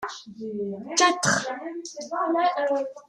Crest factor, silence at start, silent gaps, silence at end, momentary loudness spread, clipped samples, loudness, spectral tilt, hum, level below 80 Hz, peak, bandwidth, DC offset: 20 dB; 0 s; none; 0.05 s; 15 LU; under 0.1%; -25 LUFS; -2.5 dB/octave; none; -70 dBFS; -6 dBFS; 13 kHz; under 0.1%